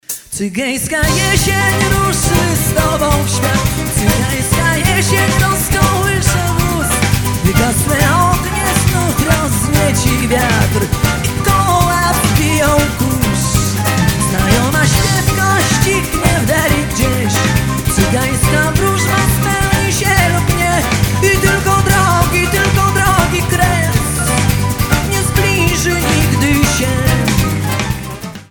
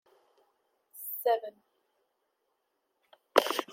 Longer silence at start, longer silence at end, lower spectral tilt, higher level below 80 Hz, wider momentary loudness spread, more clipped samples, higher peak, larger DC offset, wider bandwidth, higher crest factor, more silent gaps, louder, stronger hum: second, 0.1 s vs 0.95 s; about the same, 0.05 s vs 0 s; first, -4.5 dB/octave vs -1 dB/octave; first, -24 dBFS vs under -90 dBFS; second, 3 LU vs 15 LU; neither; first, 0 dBFS vs -4 dBFS; neither; first, 19.5 kHz vs 16.5 kHz; second, 12 dB vs 30 dB; neither; first, -13 LUFS vs -30 LUFS; neither